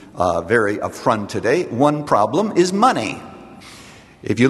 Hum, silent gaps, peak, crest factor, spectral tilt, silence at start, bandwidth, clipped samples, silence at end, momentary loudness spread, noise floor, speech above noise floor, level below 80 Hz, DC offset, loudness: none; none; 0 dBFS; 18 dB; -5.5 dB/octave; 0.15 s; 12.5 kHz; under 0.1%; 0 s; 22 LU; -42 dBFS; 25 dB; -54 dBFS; under 0.1%; -18 LUFS